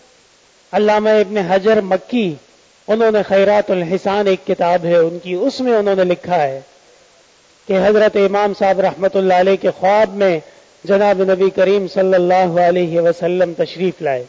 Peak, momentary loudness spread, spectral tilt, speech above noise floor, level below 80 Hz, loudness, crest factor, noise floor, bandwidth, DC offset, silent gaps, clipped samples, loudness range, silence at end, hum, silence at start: -6 dBFS; 7 LU; -6.5 dB/octave; 37 dB; -56 dBFS; -15 LUFS; 10 dB; -51 dBFS; 7.6 kHz; under 0.1%; none; under 0.1%; 2 LU; 0.05 s; none; 0.75 s